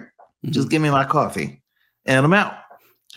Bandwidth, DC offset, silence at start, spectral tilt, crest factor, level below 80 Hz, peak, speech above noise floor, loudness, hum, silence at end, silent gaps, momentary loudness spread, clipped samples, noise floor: 15.5 kHz; under 0.1%; 0 s; -6 dB/octave; 20 dB; -60 dBFS; -2 dBFS; 31 dB; -19 LUFS; none; 0.55 s; none; 15 LU; under 0.1%; -50 dBFS